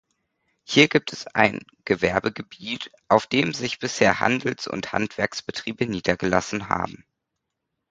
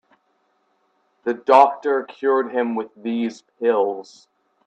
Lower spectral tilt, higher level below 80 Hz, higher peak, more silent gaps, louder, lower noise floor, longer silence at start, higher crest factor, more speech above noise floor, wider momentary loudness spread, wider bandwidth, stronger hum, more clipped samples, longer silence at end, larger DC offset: about the same, -4.5 dB/octave vs -5.5 dB/octave; first, -54 dBFS vs -74 dBFS; about the same, 0 dBFS vs 0 dBFS; neither; second, -23 LUFS vs -20 LUFS; first, -81 dBFS vs -67 dBFS; second, 0.7 s vs 1.25 s; about the same, 24 dB vs 22 dB; first, 57 dB vs 47 dB; about the same, 12 LU vs 13 LU; first, 9.4 kHz vs 8.4 kHz; neither; neither; first, 1 s vs 0.65 s; neither